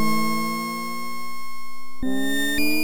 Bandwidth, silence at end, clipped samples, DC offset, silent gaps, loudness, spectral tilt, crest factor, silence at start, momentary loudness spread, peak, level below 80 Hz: 17.5 kHz; 0 s; under 0.1%; under 0.1%; none; -26 LUFS; -3.5 dB/octave; 12 dB; 0 s; 15 LU; -10 dBFS; -50 dBFS